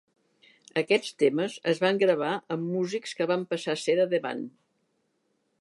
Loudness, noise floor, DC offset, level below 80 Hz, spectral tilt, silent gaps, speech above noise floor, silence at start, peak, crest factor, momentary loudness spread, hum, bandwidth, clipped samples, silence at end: -27 LUFS; -74 dBFS; under 0.1%; -80 dBFS; -5 dB/octave; none; 47 dB; 0.75 s; -10 dBFS; 20 dB; 8 LU; none; 11.5 kHz; under 0.1%; 1.1 s